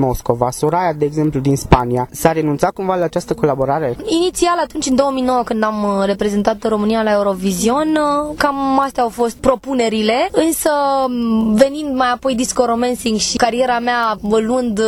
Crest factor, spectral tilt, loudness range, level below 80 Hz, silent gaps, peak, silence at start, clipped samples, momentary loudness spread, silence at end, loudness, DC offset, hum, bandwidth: 16 dB; -5 dB/octave; 1 LU; -36 dBFS; none; 0 dBFS; 0 s; under 0.1%; 3 LU; 0 s; -16 LUFS; under 0.1%; none; 17.5 kHz